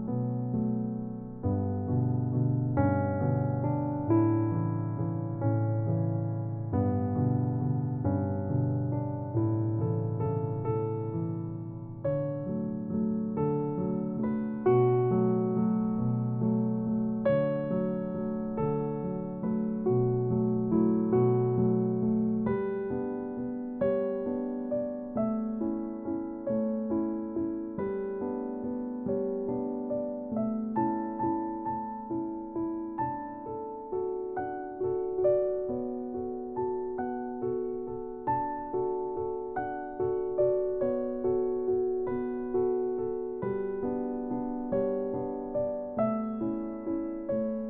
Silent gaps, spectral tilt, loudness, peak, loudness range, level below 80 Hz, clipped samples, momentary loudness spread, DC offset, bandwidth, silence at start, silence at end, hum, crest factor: none; -11.5 dB/octave; -31 LUFS; -14 dBFS; 5 LU; -56 dBFS; under 0.1%; 8 LU; under 0.1%; 3.6 kHz; 0 s; 0 s; none; 16 dB